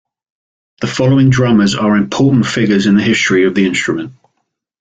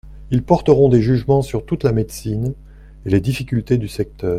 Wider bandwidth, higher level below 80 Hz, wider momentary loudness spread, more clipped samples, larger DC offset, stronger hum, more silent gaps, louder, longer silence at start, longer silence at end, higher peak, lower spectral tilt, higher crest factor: second, 9.2 kHz vs 15 kHz; second, -46 dBFS vs -36 dBFS; second, 9 LU vs 12 LU; neither; neither; neither; neither; first, -12 LUFS vs -18 LUFS; first, 0.8 s vs 0.05 s; first, 0.7 s vs 0 s; about the same, -2 dBFS vs 0 dBFS; second, -6 dB/octave vs -8 dB/octave; second, 12 dB vs 18 dB